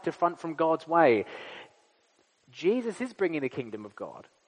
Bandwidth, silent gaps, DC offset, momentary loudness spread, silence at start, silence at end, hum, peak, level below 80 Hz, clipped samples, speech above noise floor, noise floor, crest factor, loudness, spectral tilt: 10 kHz; none; under 0.1%; 20 LU; 0.05 s; 0.25 s; none; -8 dBFS; -82 dBFS; under 0.1%; 40 dB; -68 dBFS; 22 dB; -28 LUFS; -6.5 dB/octave